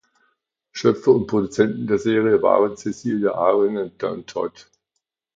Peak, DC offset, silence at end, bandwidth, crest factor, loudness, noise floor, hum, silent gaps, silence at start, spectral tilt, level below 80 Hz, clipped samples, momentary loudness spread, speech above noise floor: -2 dBFS; under 0.1%; 0.75 s; 7.8 kHz; 20 dB; -20 LUFS; -78 dBFS; none; none; 0.75 s; -6.5 dB/octave; -58 dBFS; under 0.1%; 11 LU; 59 dB